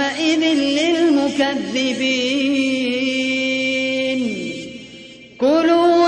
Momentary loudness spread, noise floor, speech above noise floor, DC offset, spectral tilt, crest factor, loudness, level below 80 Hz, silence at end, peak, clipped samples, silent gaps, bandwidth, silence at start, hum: 12 LU; -39 dBFS; 22 dB; under 0.1%; -3.5 dB/octave; 14 dB; -18 LUFS; -58 dBFS; 0 s; -4 dBFS; under 0.1%; none; 10 kHz; 0 s; none